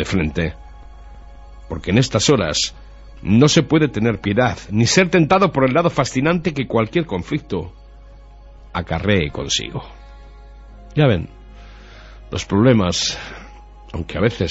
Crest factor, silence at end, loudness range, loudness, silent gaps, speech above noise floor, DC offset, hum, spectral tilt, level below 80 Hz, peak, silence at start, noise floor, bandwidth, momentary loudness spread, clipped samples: 18 dB; 0 s; 8 LU; -18 LUFS; none; 23 dB; under 0.1%; none; -5 dB/octave; -38 dBFS; -2 dBFS; 0 s; -41 dBFS; 8.2 kHz; 15 LU; under 0.1%